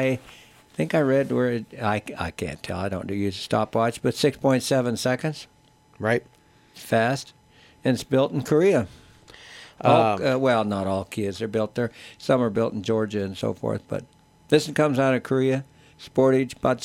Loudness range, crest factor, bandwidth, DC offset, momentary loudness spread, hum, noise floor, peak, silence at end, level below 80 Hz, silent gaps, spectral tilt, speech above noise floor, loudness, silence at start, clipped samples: 3 LU; 20 dB; 16.5 kHz; under 0.1%; 11 LU; none; -48 dBFS; -4 dBFS; 0 s; -56 dBFS; none; -6 dB/octave; 25 dB; -24 LUFS; 0 s; under 0.1%